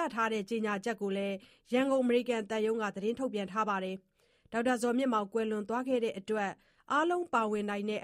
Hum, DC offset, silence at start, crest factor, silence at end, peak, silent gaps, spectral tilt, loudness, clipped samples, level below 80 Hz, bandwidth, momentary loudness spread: none; under 0.1%; 0 s; 16 dB; 0 s; -16 dBFS; none; -5 dB/octave; -33 LUFS; under 0.1%; -74 dBFS; 14.5 kHz; 6 LU